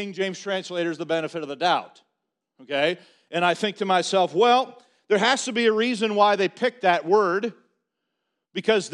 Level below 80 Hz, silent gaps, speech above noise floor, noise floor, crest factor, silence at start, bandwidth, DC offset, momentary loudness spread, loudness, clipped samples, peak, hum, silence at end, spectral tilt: -74 dBFS; none; 57 dB; -80 dBFS; 20 dB; 0 s; 11 kHz; under 0.1%; 9 LU; -23 LUFS; under 0.1%; -4 dBFS; none; 0 s; -3.5 dB/octave